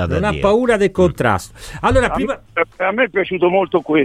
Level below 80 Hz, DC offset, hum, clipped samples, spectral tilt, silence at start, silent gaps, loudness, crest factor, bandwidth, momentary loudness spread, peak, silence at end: -34 dBFS; under 0.1%; none; under 0.1%; -6 dB/octave; 0 s; none; -16 LUFS; 14 dB; 15 kHz; 7 LU; -2 dBFS; 0 s